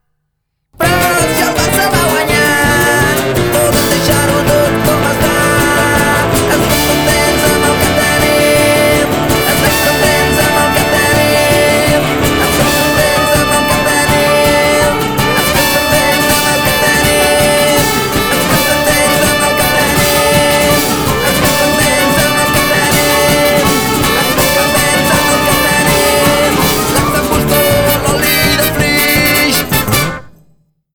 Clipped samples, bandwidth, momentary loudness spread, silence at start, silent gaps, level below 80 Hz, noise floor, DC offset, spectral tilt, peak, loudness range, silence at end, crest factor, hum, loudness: under 0.1%; over 20 kHz; 3 LU; 0.8 s; none; -28 dBFS; -68 dBFS; under 0.1%; -3.5 dB/octave; 0 dBFS; 1 LU; 0.65 s; 10 dB; none; -10 LUFS